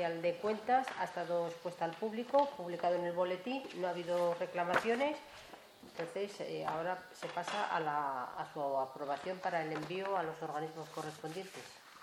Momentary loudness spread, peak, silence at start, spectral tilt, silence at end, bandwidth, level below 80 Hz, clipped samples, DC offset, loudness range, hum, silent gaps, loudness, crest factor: 11 LU; -18 dBFS; 0 s; -5 dB/octave; 0 s; 16 kHz; -80 dBFS; under 0.1%; under 0.1%; 4 LU; none; none; -38 LUFS; 20 dB